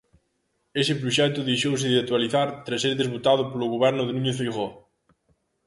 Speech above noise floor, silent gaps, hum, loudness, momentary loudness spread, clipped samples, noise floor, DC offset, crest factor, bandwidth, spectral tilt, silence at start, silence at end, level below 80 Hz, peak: 49 dB; none; none; -24 LUFS; 5 LU; under 0.1%; -73 dBFS; under 0.1%; 18 dB; 11.5 kHz; -5 dB/octave; 0.75 s; 0.9 s; -64 dBFS; -8 dBFS